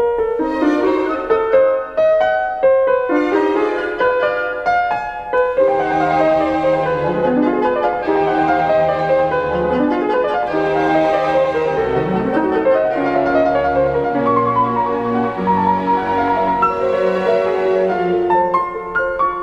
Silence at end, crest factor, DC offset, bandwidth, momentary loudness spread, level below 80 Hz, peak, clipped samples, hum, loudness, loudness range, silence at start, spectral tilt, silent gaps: 0 s; 14 dB; 0.1%; 8 kHz; 3 LU; -44 dBFS; -2 dBFS; under 0.1%; none; -16 LUFS; 1 LU; 0 s; -7.5 dB/octave; none